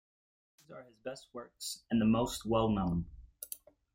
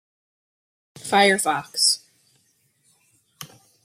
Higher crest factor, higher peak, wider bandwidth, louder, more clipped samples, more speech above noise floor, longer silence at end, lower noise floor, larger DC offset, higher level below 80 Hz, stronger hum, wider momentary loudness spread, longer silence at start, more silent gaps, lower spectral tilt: about the same, 20 dB vs 22 dB; second, -16 dBFS vs -4 dBFS; about the same, 16.5 kHz vs 16.5 kHz; second, -34 LUFS vs -19 LUFS; neither; second, 18 dB vs 45 dB; about the same, 0.4 s vs 0.4 s; second, -52 dBFS vs -65 dBFS; neither; first, -54 dBFS vs -72 dBFS; neither; second, 19 LU vs 24 LU; second, 0.7 s vs 1.05 s; neither; first, -6 dB/octave vs -1.5 dB/octave